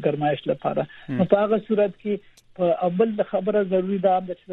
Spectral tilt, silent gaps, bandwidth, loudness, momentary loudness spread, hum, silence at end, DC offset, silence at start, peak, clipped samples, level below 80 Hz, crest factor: -9 dB/octave; none; 4.4 kHz; -23 LUFS; 8 LU; none; 0 s; under 0.1%; 0 s; -4 dBFS; under 0.1%; -62 dBFS; 18 dB